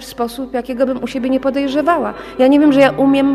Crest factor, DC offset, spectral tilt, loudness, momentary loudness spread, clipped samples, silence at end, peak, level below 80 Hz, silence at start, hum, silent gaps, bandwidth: 14 dB; under 0.1%; -5.5 dB/octave; -15 LUFS; 12 LU; under 0.1%; 0 s; 0 dBFS; -46 dBFS; 0 s; none; none; 14 kHz